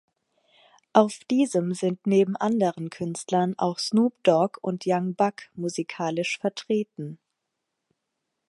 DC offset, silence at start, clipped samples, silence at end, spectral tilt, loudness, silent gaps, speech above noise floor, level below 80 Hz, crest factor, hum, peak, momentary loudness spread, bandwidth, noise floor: under 0.1%; 0.95 s; under 0.1%; 1.35 s; -5.5 dB/octave; -25 LUFS; none; 57 dB; -74 dBFS; 24 dB; none; -2 dBFS; 10 LU; 11.5 kHz; -82 dBFS